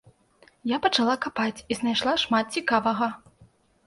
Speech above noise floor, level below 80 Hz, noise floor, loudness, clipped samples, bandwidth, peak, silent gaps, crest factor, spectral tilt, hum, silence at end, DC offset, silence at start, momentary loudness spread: 34 dB; -62 dBFS; -59 dBFS; -25 LUFS; under 0.1%; 11.5 kHz; -8 dBFS; none; 20 dB; -3.5 dB/octave; none; 0.7 s; under 0.1%; 0.65 s; 7 LU